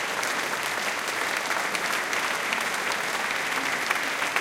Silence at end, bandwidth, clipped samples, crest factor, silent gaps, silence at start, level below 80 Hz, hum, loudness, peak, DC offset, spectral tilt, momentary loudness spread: 0 s; 17 kHz; under 0.1%; 18 dB; none; 0 s; -68 dBFS; none; -26 LUFS; -8 dBFS; under 0.1%; -0.5 dB/octave; 1 LU